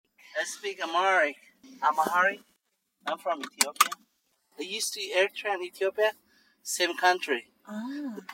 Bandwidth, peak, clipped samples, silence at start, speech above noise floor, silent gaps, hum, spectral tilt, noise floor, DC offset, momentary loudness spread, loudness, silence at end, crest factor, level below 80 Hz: 16 kHz; -4 dBFS; under 0.1%; 0.35 s; 46 dB; none; none; -1 dB/octave; -75 dBFS; under 0.1%; 15 LU; -28 LUFS; 0 s; 26 dB; -86 dBFS